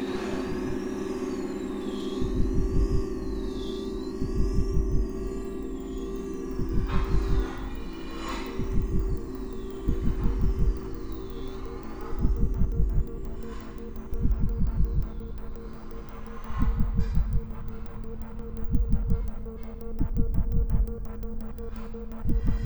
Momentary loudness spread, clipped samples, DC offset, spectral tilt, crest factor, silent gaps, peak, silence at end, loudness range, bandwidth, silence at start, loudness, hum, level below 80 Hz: 11 LU; under 0.1%; under 0.1%; -7.5 dB/octave; 18 dB; none; -10 dBFS; 0 s; 3 LU; over 20 kHz; 0 s; -32 LUFS; none; -30 dBFS